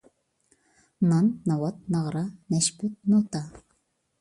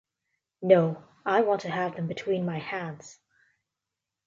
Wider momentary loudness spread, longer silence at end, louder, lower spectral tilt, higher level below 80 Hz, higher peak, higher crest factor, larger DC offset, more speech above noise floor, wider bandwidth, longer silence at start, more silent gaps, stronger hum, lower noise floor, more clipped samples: second, 10 LU vs 14 LU; second, 0.6 s vs 1.15 s; about the same, -26 LUFS vs -27 LUFS; second, -5.5 dB/octave vs -7 dB/octave; first, -64 dBFS vs -74 dBFS; second, -10 dBFS vs -6 dBFS; about the same, 18 dB vs 22 dB; neither; second, 47 dB vs 61 dB; first, 11.5 kHz vs 7.6 kHz; first, 1 s vs 0.6 s; neither; neither; second, -72 dBFS vs -87 dBFS; neither